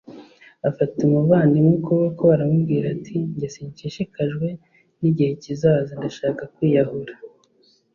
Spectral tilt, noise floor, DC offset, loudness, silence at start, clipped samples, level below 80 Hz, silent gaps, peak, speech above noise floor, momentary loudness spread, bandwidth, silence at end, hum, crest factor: -9 dB/octave; -60 dBFS; under 0.1%; -21 LUFS; 0.1 s; under 0.1%; -58 dBFS; none; -4 dBFS; 40 dB; 13 LU; 7.2 kHz; 0.65 s; none; 18 dB